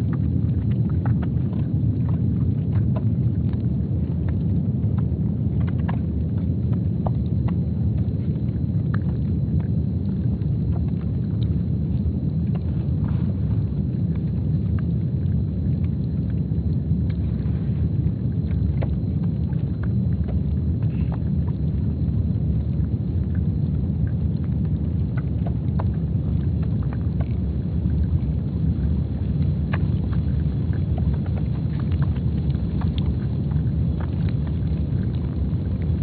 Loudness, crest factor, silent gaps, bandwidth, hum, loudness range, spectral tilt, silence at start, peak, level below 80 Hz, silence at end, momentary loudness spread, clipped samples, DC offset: -23 LUFS; 12 dB; none; 4.5 kHz; none; 1 LU; -10.5 dB/octave; 0 s; -8 dBFS; -30 dBFS; 0 s; 2 LU; under 0.1%; under 0.1%